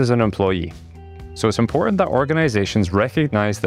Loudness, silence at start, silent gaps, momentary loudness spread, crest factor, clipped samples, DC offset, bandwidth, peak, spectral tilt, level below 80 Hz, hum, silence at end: -19 LUFS; 0 s; none; 8 LU; 14 dB; under 0.1%; under 0.1%; 13.5 kHz; -4 dBFS; -6.5 dB/octave; -42 dBFS; none; 0 s